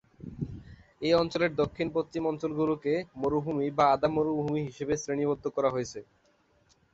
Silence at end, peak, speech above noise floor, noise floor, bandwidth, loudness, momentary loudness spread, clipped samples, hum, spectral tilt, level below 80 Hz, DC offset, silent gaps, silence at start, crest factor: 0.9 s; -10 dBFS; 38 dB; -67 dBFS; 8 kHz; -29 LUFS; 14 LU; under 0.1%; none; -6 dB/octave; -56 dBFS; under 0.1%; none; 0.25 s; 20 dB